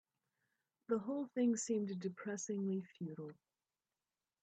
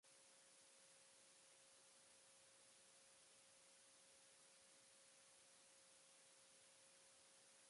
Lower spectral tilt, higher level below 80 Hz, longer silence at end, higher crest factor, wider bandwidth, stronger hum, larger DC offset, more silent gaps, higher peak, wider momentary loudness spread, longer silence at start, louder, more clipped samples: first, -5.5 dB/octave vs 0 dB/octave; about the same, -88 dBFS vs under -90 dBFS; first, 1.1 s vs 0 s; about the same, 16 dB vs 14 dB; second, 9.4 kHz vs 11.5 kHz; neither; neither; neither; first, -26 dBFS vs -58 dBFS; first, 12 LU vs 0 LU; first, 0.9 s vs 0.05 s; first, -41 LUFS vs -68 LUFS; neither